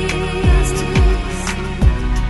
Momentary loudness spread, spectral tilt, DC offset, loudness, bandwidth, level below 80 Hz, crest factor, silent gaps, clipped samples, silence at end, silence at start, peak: 6 LU; -5.5 dB/octave; under 0.1%; -17 LUFS; 12 kHz; -18 dBFS; 12 dB; none; under 0.1%; 0 s; 0 s; -2 dBFS